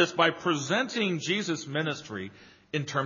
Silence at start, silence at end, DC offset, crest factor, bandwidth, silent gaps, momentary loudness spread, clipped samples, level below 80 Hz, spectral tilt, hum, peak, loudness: 0 s; 0 s; under 0.1%; 22 dB; 7.4 kHz; none; 13 LU; under 0.1%; -74 dBFS; -3 dB/octave; none; -8 dBFS; -29 LUFS